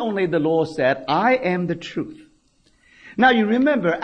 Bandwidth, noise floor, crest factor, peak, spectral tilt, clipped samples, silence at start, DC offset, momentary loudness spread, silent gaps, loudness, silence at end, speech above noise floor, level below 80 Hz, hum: 9.4 kHz; -60 dBFS; 16 dB; -4 dBFS; -7 dB/octave; under 0.1%; 0 s; under 0.1%; 13 LU; none; -20 LUFS; 0 s; 40 dB; -58 dBFS; none